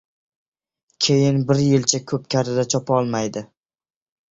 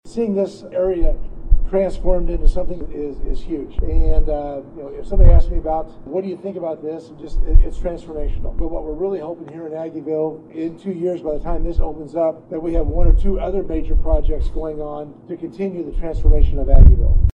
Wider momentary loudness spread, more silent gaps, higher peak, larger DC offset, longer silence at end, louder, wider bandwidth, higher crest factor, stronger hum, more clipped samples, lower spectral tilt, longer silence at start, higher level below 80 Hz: second, 8 LU vs 11 LU; neither; about the same, -2 dBFS vs 0 dBFS; neither; first, 0.85 s vs 0.05 s; about the same, -20 LUFS vs -22 LUFS; first, 8 kHz vs 3.1 kHz; about the same, 20 dB vs 16 dB; neither; second, under 0.1% vs 0.2%; second, -5 dB/octave vs -10 dB/octave; first, 1 s vs 0.05 s; second, -56 dBFS vs -16 dBFS